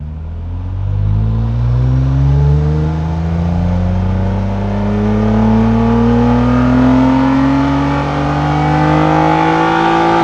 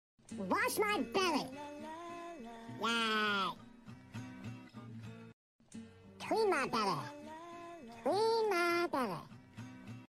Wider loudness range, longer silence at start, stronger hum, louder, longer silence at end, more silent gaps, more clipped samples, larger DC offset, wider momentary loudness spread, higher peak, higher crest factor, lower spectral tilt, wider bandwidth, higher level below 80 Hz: about the same, 3 LU vs 5 LU; second, 0 s vs 0.3 s; neither; first, -13 LUFS vs -35 LUFS; about the same, 0 s vs 0.05 s; second, none vs 5.33-5.59 s; neither; neither; second, 6 LU vs 20 LU; first, 0 dBFS vs -20 dBFS; second, 12 dB vs 18 dB; first, -8.5 dB/octave vs -4 dB/octave; second, 8.2 kHz vs 16.5 kHz; first, -22 dBFS vs -72 dBFS